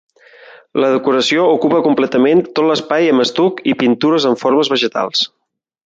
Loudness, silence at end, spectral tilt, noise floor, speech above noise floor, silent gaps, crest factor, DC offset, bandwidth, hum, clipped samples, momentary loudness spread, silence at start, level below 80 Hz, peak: -14 LUFS; 0.6 s; -4.5 dB/octave; -74 dBFS; 60 dB; none; 14 dB; under 0.1%; 7.8 kHz; none; under 0.1%; 4 LU; 0.75 s; -62 dBFS; -2 dBFS